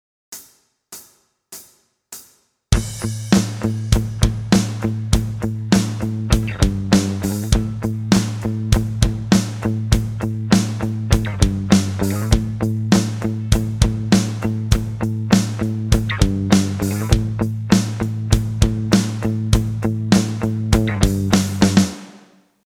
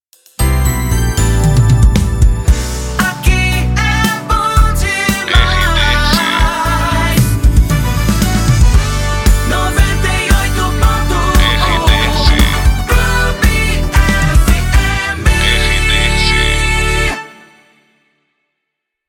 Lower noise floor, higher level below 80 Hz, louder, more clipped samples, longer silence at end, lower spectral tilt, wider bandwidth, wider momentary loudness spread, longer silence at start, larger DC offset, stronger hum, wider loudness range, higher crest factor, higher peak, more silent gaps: second, -54 dBFS vs -75 dBFS; second, -26 dBFS vs -14 dBFS; second, -19 LUFS vs -12 LUFS; neither; second, 0.5 s vs 1.8 s; about the same, -5.5 dB/octave vs -4.5 dB/octave; about the same, 16.5 kHz vs 17.5 kHz; first, 8 LU vs 4 LU; about the same, 0.3 s vs 0.4 s; neither; neither; about the same, 2 LU vs 1 LU; first, 18 dB vs 12 dB; about the same, 0 dBFS vs 0 dBFS; neither